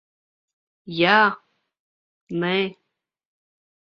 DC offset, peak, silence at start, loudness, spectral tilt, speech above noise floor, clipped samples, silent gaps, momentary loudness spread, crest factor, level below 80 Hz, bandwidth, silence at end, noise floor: under 0.1%; -2 dBFS; 0.85 s; -20 LUFS; -6.5 dB/octave; 59 dB; under 0.1%; 1.79-2.27 s; 16 LU; 24 dB; -70 dBFS; 6.4 kHz; 1.25 s; -79 dBFS